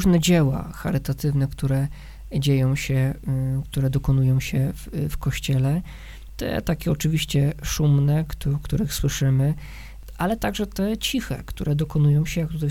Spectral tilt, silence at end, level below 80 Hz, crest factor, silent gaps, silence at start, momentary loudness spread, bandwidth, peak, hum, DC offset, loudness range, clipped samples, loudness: -6 dB/octave; 0 s; -36 dBFS; 16 dB; none; 0 s; 9 LU; 16.5 kHz; -6 dBFS; none; under 0.1%; 2 LU; under 0.1%; -23 LUFS